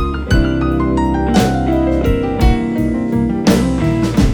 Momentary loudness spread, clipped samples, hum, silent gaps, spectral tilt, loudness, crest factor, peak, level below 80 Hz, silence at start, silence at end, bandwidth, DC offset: 3 LU; under 0.1%; none; none; -7 dB/octave; -15 LUFS; 14 dB; 0 dBFS; -20 dBFS; 0 s; 0 s; over 20 kHz; under 0.1%